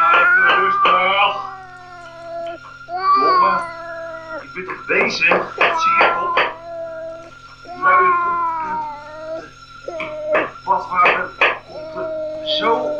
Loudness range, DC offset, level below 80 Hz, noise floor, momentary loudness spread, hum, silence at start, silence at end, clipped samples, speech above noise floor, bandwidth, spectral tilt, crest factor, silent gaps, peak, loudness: 4 LU; 0.1%; -54 dBFS; -39 dBFS; 18 LU; none; 0 s; 0 s; under 0.1%; 23 dB; 9.6 kHz; -3.5 dB/octave; 18 dB; none; -2 dBFS; -16 LUFS